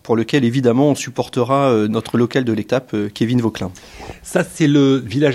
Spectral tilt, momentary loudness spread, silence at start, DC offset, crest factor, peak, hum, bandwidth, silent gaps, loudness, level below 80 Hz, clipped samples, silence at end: -6.5 dB/octave; 10 LU; 0.05 s; under 0.1%; 16 dB; -2 dBFS; none; 13.5 kHz; none; -17 LUFS; -50 dBFS; under 0.1%; 0 s